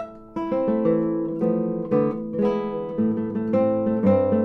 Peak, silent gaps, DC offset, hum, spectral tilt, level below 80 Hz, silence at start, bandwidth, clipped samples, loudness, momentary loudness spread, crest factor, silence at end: -8 dBFS; none; under 0.1%; none; -10.5 dB/octave; -54 dBFS; 0 s; 4.5 kHz; under 0.1%; -23 LUFS; 7 LU; 14 dB; 0 s